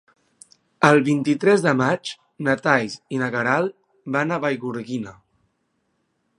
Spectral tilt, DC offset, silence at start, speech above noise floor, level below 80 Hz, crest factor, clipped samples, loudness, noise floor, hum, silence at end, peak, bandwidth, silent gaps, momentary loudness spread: -6 dB/octave; under 0.1%; 0.8 s; 51 dB; -64 dBFS; 22 dB; under 0.1%; -21 LUFS; -71 dBFS; none; 1.25 s; 0 dBFS; 11 kHz; none; 13 LU